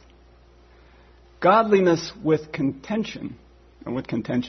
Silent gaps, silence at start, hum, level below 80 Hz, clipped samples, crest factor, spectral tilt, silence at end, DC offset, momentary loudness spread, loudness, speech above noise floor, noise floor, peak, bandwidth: none; 1.4 s; 60 Hz at -50 dBFS; -54 dBFS; under 0.1%; 20 dB; -6.5 dB/octave; 0 s; under 0.1%; 16 LU; -22 LUFS; 30 dB; -52 dBFS; -4 dBFS; 6.4 kHz